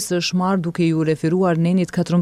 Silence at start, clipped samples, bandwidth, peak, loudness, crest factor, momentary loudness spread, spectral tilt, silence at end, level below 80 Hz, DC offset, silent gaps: 0 s; under 0.1%; 14 kHz; -8 dBFS; -19 LUFS; 10 dB; 2 LU; -6 dB/octave; 0 s; -54 dBFS; under 0.1%; none